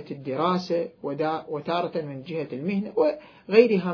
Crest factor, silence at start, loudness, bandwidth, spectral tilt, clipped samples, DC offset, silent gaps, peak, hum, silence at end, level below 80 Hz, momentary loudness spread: 22 dB; 0 s; -26 LUFS; 5.4 kHz; -7.5 dB/octave; under 0.1%; under 0.1%; none; -4 dBFS; none; 0 s; -70 dBFS; 13 LU